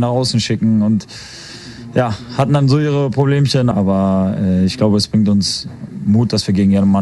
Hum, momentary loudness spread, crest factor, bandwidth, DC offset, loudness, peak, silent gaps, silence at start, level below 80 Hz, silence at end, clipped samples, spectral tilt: none; 12 LU; 14 dB; 11.5 kHz; under 0.1%; -15 LUFS; 0 dBFS; none; 0 s; -46 dBFS; 0 s; under 0.1%; -6.5 dB/octave